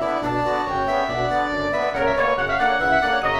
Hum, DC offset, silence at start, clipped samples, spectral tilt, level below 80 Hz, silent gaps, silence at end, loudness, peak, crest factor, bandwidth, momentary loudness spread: none; under 0.1%; 0 s; under 0.1%; -5 dB/octave; -42 dBFS; none; 0 s; -21 LUFS; -6 dBFS; 14 dB; 12.5 kHz; 4 LU